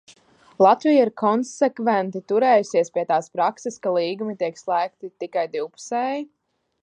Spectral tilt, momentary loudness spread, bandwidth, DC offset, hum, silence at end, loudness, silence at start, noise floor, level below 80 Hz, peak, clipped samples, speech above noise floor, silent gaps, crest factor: -5 dB/octave; 11 LU; 9.8 kHz; under 0.1%; none; 0.6 s; -22 LUFS; 0.6 s; -53 dBFS; -78 dBFS; -2 dBFS; under 0.1%; 32 dB; none; 20 dB